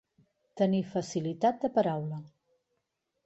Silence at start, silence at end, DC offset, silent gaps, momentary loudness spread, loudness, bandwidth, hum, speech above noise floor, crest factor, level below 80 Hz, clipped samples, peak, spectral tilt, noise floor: 0.55 s; 1 s; under 0.1%; none; 9 LU; -30 LUFS; 8.2 kHz; none; 52 dB; 18 dB; -72 dBFS; under 0.1%; -14 dBFS; -7 dB/octave; -82 dBFS